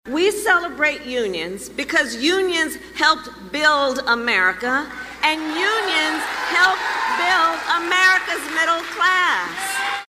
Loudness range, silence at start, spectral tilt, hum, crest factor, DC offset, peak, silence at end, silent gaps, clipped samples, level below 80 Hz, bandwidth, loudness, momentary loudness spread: 2 LU; 0.05 s; -1.5 dB/octave; none; 18 dB; under 0.1%; -2 dBFS; 0.05 s; none; under 0.1%; -54 dBFS; 15.5 kHz; -18 LUFS; 8 LU